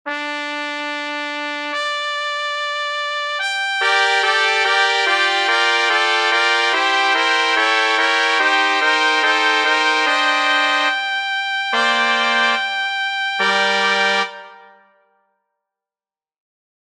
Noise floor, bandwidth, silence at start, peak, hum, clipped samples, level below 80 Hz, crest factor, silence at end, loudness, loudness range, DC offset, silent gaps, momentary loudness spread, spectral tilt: under -90 dBFS; 12.5 kHz; 0.05 s; 0 dBFS; none; under 0.1%; -74 dBFS; 18 dB; 2.35 s; -16 LUFS; 6 LU; under 0.1%; none; 9 LU; -0.5 dB/octave